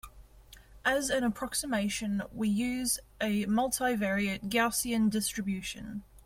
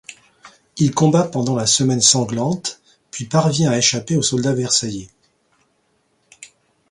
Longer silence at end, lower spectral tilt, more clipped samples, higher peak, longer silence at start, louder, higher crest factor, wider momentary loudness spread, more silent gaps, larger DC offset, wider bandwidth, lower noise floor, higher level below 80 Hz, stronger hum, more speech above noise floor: second, 0.05 s vs 0.45 s; about the same, -3.5 dB/octave vs -4 dB/octave; neither; second, -14 dBFS vs 0 dBFS; about the same, 0.05 s vs 0.1 s; second, -31 LUFS vs -17 LUFS; about the same, 16 dB vs 20 dB; second, 6 LU vs 15 LU; neither; neither; first, 16.5 kHz vs 11.5 kHz; second, -55 dBFS vs -64 dBFS; about the same, -54 dBFS vs -56 dBFS; neither; second, 24 dB vs 47 dB